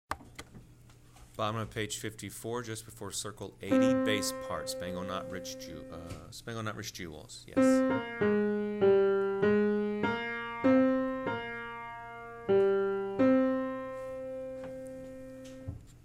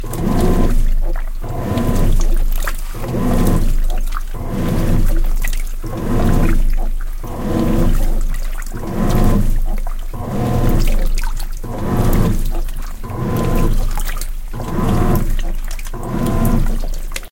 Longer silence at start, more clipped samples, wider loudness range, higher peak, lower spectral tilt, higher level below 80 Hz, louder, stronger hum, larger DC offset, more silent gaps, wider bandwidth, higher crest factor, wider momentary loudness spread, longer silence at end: about the same, 0.1 s vs 0 s; neither; first, 9 LU vs 1 LU; second, -16 dBFS vs 0 dBFS; second, -5 dB/octave vs -6.5 dB/octave; second, -60 dBFS vs -16 dBFS; second, -31 LUFS vs -20 LUFS; neither; neither; neither; about the same, 16 kHz vs 17 kHz; about the same, 16 dB vs 14 dB; first, 18 LU vs 11 LU; about the same, 0.05 s vs 0.05 s